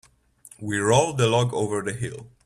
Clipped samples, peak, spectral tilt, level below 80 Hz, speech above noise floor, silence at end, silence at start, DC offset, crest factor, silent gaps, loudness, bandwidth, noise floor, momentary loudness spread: under 0.1%; -4 dBFS; -5 dB/octave; -56 dBFS; 29 dB; 0.2 s; 0.6 s; under 0.1%; 20 dB; none; -23 LUFS; 13 kHz; -52 dBFS; 13 LU